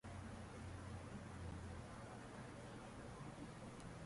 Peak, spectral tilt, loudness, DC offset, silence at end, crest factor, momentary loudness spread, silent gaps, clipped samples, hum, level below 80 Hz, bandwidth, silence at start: -40 dBFS; -6 dB/octave; -54 LUFS; under 0.1%; 0 s; 14 dB; 2 LU; none; under 0.1%; none; -62 dBFS; 11.5 kHz; 0.05 s